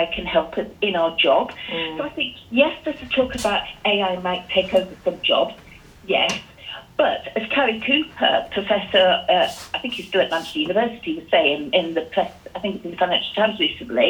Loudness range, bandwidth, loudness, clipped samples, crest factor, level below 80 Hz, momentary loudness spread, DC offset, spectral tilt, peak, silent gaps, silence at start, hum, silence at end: 2 LU; 19 kHz; -21 LUFS; under 0.1%; 18 dB; -50 dBFS; 9 LU; under 0.1%; -4 dB/octave; -2 dBFS; none; 0 s; none; 0 s